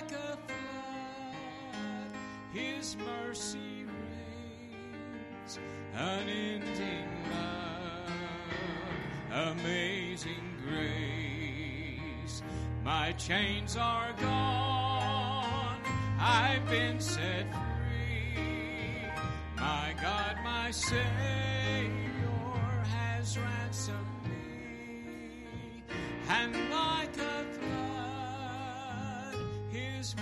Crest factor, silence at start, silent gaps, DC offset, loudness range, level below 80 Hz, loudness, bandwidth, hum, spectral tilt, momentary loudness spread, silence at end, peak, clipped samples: 18 dB; 0 s; none; under 0.1%; 9 LU; -50 dBFS; -35 LUFS; 12.5 kHz; none; -4.5 dB/octave; 12 LU; 0 s; -18 dBFS; under 0.1%